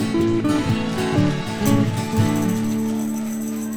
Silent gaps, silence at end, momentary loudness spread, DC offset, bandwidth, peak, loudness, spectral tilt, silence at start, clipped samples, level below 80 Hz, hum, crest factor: none; 0 s; 5 LU; under 0.1%; over 20 kHz; -4 dBFS; -21 LUFS; -6 dB/octave; 0 s; under 0.1%; -44 dBFS; none; 16 dB